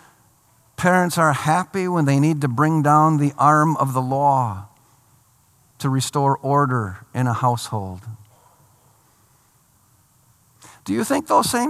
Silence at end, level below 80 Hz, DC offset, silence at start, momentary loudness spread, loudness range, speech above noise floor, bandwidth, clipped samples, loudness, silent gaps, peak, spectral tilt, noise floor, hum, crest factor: 0 s; -62 dBFS; under 0.1%; 0.8 s; 13 LU; 11 LU; 40 dB; 15 kHz; under 0.1%; -19 LUFS; none; -2 dBFS; -6 dB/octave; -58 dBFS; none; 18 dB